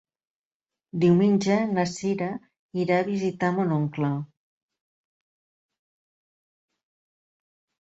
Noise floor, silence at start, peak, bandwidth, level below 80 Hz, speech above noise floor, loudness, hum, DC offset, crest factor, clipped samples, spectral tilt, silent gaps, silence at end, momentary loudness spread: under -90 dBFS; 0.95 s; -8 dBFS; 8 kHz; -68 dBFS; over 67 dB; -24 LUFS; none; under 0.1%; 18 dB; under 0.1%; -7 dB/octave; 2.59-2.69 s; 3.65 s; 14 LU